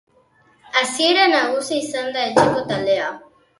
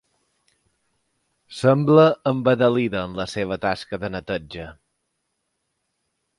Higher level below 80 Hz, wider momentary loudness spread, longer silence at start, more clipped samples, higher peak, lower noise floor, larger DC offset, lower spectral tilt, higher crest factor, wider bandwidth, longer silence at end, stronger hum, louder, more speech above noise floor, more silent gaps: second, -58 dBFS vs -52 dBFS; second, 9 LU vs 18 LU; second, 0.75 s vs 1.5 s; neither; about the same, 0 dBFS vs -2 dBFS; second, -57 dBFS vs -75 dBFS; neither; second, -3 dB/octave vs -7 dB/octave; about the same, 20 dB vs 20 dB; about the same, 11.5 kHz vs 11.5 kHz; second, 0.4 s vs 1.65 s; neither; about the same, -18 LUFS vs -20 LUFS; second, 38 dB vs 55 dB; neither